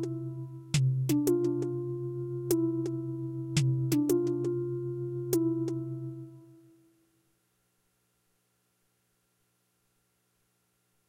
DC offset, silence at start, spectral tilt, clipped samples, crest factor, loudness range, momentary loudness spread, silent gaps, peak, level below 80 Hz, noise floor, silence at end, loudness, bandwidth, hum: under 0.1%; 0 s; -7 dB/octave; under 0.1%; 20 dB; 8 LU; 11 LU; none; -14 dBFS; -64 dBFS; -75 dBFS; 4.55 s; -31 LUFS; 16 kHz; none